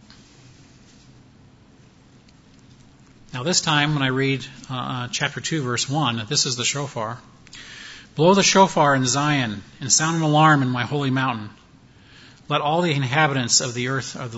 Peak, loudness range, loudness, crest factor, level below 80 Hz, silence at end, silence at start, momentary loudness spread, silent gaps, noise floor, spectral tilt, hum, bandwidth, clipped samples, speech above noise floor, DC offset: -2 dBFS; 6 LU; -20 LUFS; 20 dB; -58 dBFS; 0 s; 3.3 s; 17 LU; none; -51 dBFS; -3.5 dB/octave; none; 8 kHz; under 0.1%; 30 dB; under 0.1%